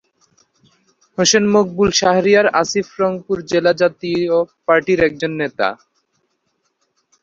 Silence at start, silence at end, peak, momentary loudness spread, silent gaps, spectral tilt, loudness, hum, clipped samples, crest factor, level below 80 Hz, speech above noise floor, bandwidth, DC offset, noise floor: 1.2 s; 1.5 s; 0 dBFS; 9 LU; none; -3.5 dB/octave; -16 LUFS; none; under 0.1%; 18 dB; -52 dBFS; 53 dB; 7.8 kHz; under 0.1%; -68 dBFS